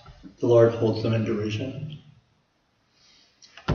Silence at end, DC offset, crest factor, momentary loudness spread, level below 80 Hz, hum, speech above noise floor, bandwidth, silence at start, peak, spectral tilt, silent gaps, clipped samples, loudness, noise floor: 0 s; under 0.1%; 22 dB; 19 LU; -58 dBFS; none; 46 dB; 7 kHz; 0.1 s; -4 dBFS; -8 dB/octave; none; under 0.1%; -23 LUFS; -68 dBFS